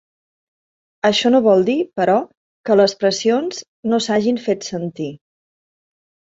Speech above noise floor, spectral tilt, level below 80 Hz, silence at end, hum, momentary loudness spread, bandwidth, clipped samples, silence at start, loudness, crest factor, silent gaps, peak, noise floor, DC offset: over 73 dB; -4.5 dB/octave; -62 dBFS; 1.25 s; none; 13 LU; 8 kHz; under 0.1%; 1.05 s; -17 LUFS; 18 dB; 2.37-2.64 s, 3.68-3.83 s; 0 dBFS; under -90 dBFS; under 0.1%